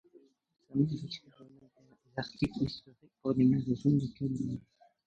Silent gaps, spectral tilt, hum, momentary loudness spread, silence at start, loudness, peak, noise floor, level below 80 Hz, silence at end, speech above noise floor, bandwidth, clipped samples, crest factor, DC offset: none; -8 dB/octave; none; 16 LU; 0.7 s; -33 LUFS; -16 dBFS; -65 dBFS; -60 dBFS; 0.45 s; 34 dB; 8 kHz; under 0.1%; 18 dB; under 0.1%